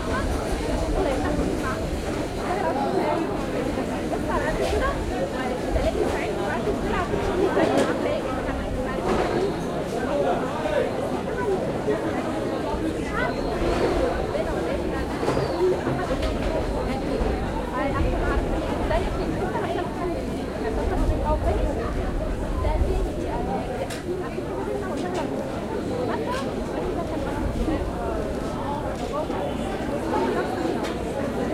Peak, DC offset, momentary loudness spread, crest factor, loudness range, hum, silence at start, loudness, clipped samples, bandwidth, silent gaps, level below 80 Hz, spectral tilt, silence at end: -8 dBFS; 0.1%; 5 LU; 16 dB; 3 LU; none; 0 s; -26 LUFS; under 0.1%; 15.5 kHz; none; -32 dBFS; -6.5 dB/octave; 0 s